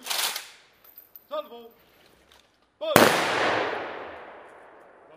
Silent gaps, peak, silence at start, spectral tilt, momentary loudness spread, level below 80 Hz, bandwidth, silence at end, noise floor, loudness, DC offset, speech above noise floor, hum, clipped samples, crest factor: none; 0 dBFS; 0 s; -2.5 dB/octave; 27 LU; -66 dBFS; 16 kHz; 0.65 s; -60 dBFS; -24 LUFS; under 0.1%; 38 dB; none; under 0.1%; 28 dB